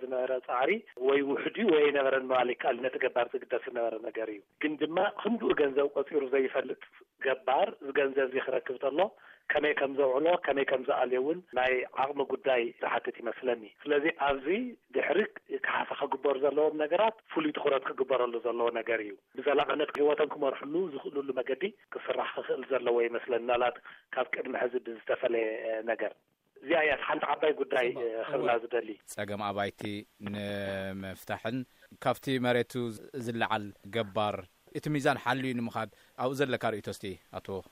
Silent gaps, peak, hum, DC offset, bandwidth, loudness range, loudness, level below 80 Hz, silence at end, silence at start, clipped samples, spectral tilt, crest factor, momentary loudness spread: none; -12 dBFS; none; under 0.1%; 15 kHz; 4 LU; -31 LUFS; -68 dBFS; 0.1 s; 0 s; under 0.1%; -5.5 dB/octave; 18 dB; 10 LU